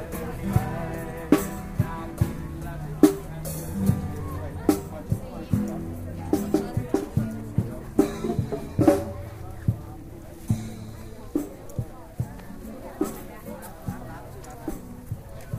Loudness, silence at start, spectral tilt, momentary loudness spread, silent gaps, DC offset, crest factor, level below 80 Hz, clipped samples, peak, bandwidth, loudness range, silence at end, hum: -28 LUFS; 0 s; -7.5 dB/octave; 16 LU; none; under 0.1%; 24 dB; -42 dBFS; under 0.1%; -2 dBFS; 16 kHz; 9 LU; 0 s; none